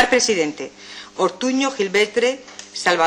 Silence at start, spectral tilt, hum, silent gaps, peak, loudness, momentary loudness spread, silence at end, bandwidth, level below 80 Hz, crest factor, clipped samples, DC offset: 0 s; -2.5 dB/octave; none; none; -6 dBFS; -19 LUFS; 16 LU; 0 s; 18 kHz; -60 dBFS; 14 dB; under 0.1%; under 0.1%